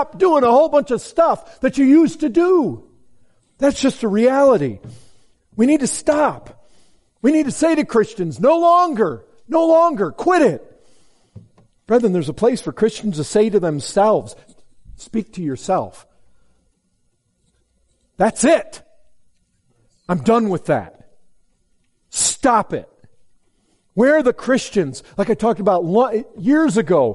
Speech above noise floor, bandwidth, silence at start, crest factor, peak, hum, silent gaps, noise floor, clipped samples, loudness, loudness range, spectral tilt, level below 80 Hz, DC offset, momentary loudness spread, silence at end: 49 dB; 11.5 kHz; 0 s; 14 dB; -4 dBFS; none; none; -65 dBFS; under 0.1%; -17 LUFS; 7 LU; -5 dB/octave; -52 dBFS; under 0.1%; 12 LU; 0 s